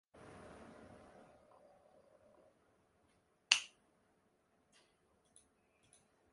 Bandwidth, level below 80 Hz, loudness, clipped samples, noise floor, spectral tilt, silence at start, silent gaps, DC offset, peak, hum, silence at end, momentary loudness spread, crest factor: 11.5 kHz; -80 dBFS; -34 LUFS; under 0.1%; -77 dBFS; 1 dB/octave; 0.25 s; none; under 0.1%; -6 dBFS; none; 2.65 s; 27 LU; 44 dB